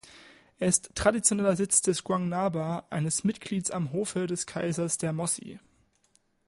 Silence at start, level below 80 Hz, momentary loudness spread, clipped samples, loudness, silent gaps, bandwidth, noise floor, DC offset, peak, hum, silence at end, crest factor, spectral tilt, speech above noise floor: 0.05 s; -56 dBFS; 8 LU; under 0.1%; -28 LUFS; none; 12 kHz; -69 dBFS; under 0.1%; -8 dBFS; none; 0.9 s; 22 dB; -4.5 dB/octave; 40 dB